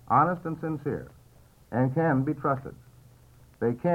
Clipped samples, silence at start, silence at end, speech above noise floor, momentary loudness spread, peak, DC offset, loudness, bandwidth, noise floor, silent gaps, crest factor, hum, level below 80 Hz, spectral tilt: under 0.1%; 0.1 s; 0 s; 30 dB; 12 LU; -10 dBFS; under 0.1%; -28 LUFS; 13.5 kHz; -56 dBFS; none; 18 dB; none; -58 dBFS; -10 dB/octave